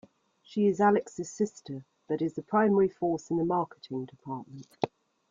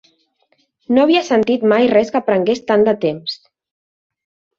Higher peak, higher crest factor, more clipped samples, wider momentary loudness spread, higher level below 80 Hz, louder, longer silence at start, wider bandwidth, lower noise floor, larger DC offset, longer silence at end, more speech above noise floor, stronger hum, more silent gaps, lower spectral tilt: second, -8 dBFS vs -2 dBFS; first, 22 dB vs 16 dB; neither; first, 16 LU vs 9 LU; second, -70 dBFS vs -58 dBFS; second, -29 LUFS vs -15 LUFS; second, 0.5 s vs 0.9 s; about the same, 7.6 kHz vs 7.4 kHz; second, -58 dBFS vs -62 dBFS; neither; second, 0.45 s vs 1.25 s; second, 30 dB vs 48 dB; neither; neither; first, -7 dB/octave vs -5.5 dB/octave